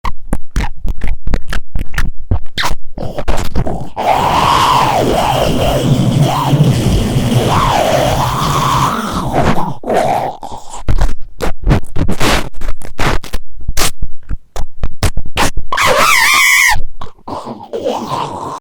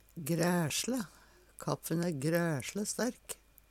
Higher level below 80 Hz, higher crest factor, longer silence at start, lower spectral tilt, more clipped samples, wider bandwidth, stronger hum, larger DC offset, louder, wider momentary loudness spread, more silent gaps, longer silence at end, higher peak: first, -20 dBFS vs -66 dBFS; second, 10 dB vs 18 dB; about the same, 0.05 s vs 0.15 s; about the same, -4.5 dB/octave vs -4.5 dB/octave; first, 0.4% vs under 0.1%; first, over 20 kHz vs 17.5 kHz; neither; neither; first, -14 LUFS vs -34 LUFS; about the same, 16 LU vs 15 LU; neither; second, 0 s vs 0.35 s; first, 0 dBFS vs -16 dBFS